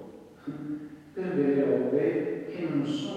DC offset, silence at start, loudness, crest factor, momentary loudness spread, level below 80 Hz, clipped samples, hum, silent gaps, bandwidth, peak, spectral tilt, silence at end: under 0.1%; 0 s; -29 LUFS; 16 dB; 16 LU; -70 dBFS; under 0.1%; none; none; 9 kHz; -14 dBFS; -7.5 dB/octave; 0 s